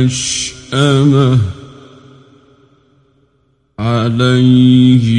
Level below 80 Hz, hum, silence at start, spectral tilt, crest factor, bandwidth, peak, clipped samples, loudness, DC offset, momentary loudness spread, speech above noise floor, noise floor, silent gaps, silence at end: -44 dBFS; none; 0 s; -6 dB/octave; 12 dB; 11 kHz; 0 dBFS; under 0.1%; -11 LUFS; under 0.1%; 11 LU; 48 dB; -58 dBFS; none; 0 s